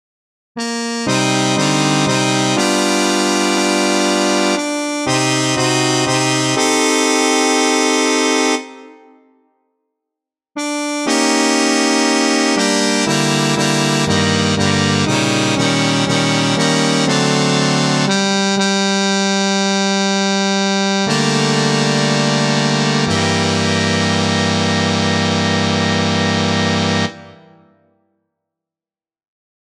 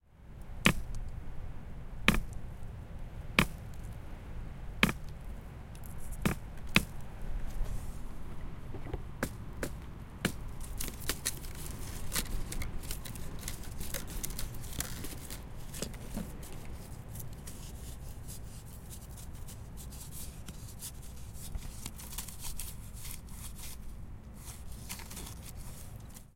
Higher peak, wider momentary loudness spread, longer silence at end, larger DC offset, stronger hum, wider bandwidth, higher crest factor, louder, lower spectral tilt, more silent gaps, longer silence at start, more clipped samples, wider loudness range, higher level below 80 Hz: first, 0 dBFS vs -6 dBFS; second, 3 LU vs 17 LU; first, 2.3 s vs 0 s; neither; neither; second, 14 kHz vs 17 kHz; second, 16 dB vs 32 dB; first, -15 LUFS vs -39 LUFS; about the same, -3.5 dB/octave vs -3.5 dB/octave; neither; first, 0.55 s vs 0.05 s; neither; second, 4 LU vs 10 LU; second, -54 dBFS vs -44 dBFS